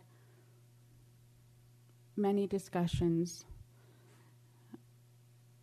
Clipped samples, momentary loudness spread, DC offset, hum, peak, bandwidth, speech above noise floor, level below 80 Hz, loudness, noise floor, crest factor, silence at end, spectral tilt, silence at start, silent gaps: under 0.1%; 25 LU; under 0.1%; none; -22 dBFS; 13.5 kHz; 29 dB; -58 dBFS; -35 LUFS; -63 dBFS; 18 dB; 0.85 s; -7 dB/octave; 2.15 s; none